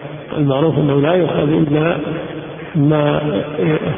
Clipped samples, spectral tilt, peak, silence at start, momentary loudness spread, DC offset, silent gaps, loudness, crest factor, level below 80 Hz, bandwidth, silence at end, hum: under 0.1%; -13 dB/octave; 0 dBFS; 0 s; 10 LU; under 0.1%; none; -16 LUFS; 16 dB; -44 dBFS; 3.7 kHz; 0 s; none